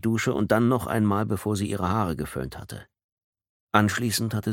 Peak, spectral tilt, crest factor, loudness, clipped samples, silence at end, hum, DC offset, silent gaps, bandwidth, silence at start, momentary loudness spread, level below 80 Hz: -2 dBFS; -5.5 dB/octave; 24 dB; -25 LUFS; under 0.1%; 0 s; none; under 0.1%; 3.04-3.17 s, 3.24-3.33 s, 3.49-3.67 s; 17.5 kHz; 0.05 s; 13 LU; -50 dBFS